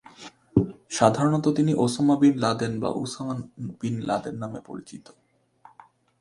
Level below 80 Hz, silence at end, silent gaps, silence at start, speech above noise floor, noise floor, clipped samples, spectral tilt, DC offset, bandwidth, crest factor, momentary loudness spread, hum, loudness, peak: -54 dBFS; 1.2 s; none; 0.2 s; 32 dB; -56 dBFS; under 0.1%; -6 dB/octave; under 0.1%; 11.5 kHz; 24 dB; 20 LU; none; -24 LUFS; -2 dBFS